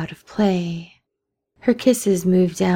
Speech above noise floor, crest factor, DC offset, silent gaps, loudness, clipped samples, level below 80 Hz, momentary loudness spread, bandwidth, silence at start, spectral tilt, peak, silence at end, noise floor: 61 dB; 16 dB; under 0.1%; none; -20 LUFS; under 0.1%; -54 dBFS; 12 LU; 18 kHz; 0 s; -6 dB/octave; -4 dBFS; 0 s; -80 dBFS